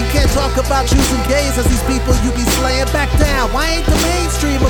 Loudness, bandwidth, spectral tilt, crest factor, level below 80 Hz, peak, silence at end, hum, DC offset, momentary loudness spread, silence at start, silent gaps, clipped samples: -15 LUFS; 19.5 kHz; -4.5 dB/octave; 14 dB; -18 dBFS; 0 dBFS; 0 s; none; under 0.1%; 2 LU; 0 s; none; under 0.1%